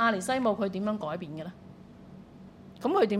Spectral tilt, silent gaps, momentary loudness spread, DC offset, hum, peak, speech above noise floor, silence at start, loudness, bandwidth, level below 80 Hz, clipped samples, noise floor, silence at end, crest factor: -5.5 dB/octave; none; 23 LU; under 0.1%; none; -12 dBFS; 21 dB; 0 s; -30 LUFS; 15.5 kHz; -64 dBFS; under 0.1%; -50 dBFS; 0 s; 18 dB